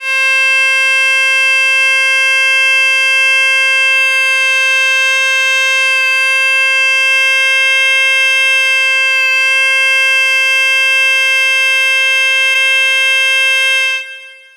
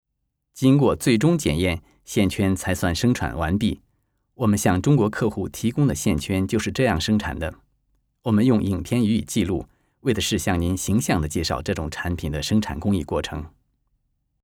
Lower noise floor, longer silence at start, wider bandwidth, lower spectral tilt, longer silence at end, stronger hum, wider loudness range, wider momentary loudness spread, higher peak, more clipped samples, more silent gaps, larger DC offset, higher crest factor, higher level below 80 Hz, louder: second, -32 dBFS vs -77 dBFS; second, 0 s vs 0.55 s; about the same, 17 kHz vs 18.5 kHz; second, 7 dB/octave vs -5.5 dB/octave; second, 0.2 s vs 0.95 s; neither; about the same, 1 LU vs 3 LU; second, 1 LU vs 9 LU; about the same, -2 dBFS vs -4 dBFS; neither; neither; neither; second, 8 dB vs 18 dB; second, -88 dBFS vs -40 dBFS; first, -8 LUFS vs -22 LUFS